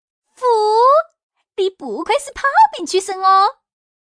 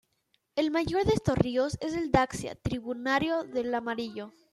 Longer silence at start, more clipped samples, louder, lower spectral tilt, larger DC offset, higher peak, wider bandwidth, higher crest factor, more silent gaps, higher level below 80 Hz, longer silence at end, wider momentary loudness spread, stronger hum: second, 0.4 s vs 0.55 s; neither; first, -15 LUFS vs -29 LUFS; second, -1.5 dB/octave vs -6 dB/octave; neither; first, -4 dBFS vs -8 dBFS; second, 10.5 kHz vs 13 kHz; second, 14 dB vs 22 dB; first, 1.23-1.29 s vs none; second, -56 dBFS vs -50 dBFS; first, 0.65 s vs 0.25 s; about the same, 9 LU vs 9 LU; neither